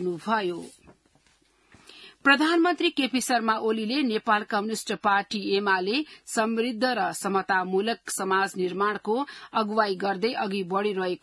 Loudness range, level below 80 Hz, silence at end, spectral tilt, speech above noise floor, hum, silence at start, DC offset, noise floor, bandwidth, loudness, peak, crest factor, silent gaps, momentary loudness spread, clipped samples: 2 LU; -72 dBFS; 0.05 s; -3.5 dB/octave; 38 dB; none; 0 s; under 0.1%; -64 dBFS; 12 kHz; -25 LUFS; -8 dBFS; 20 dB; none; 7 LU; under 0.1%